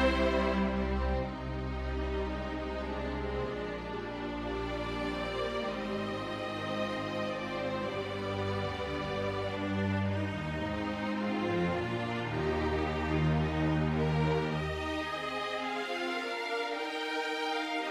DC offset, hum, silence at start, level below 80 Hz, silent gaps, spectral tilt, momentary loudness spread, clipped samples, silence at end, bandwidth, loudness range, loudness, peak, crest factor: under 0.1%; none; 0 s; -44 dBFS; none; -6.5 dB/octave; 6 LU; under 0.1%; 0 s; 13 kHz; 5 LU; -34 LUFS; -16 dBFS; 18 dB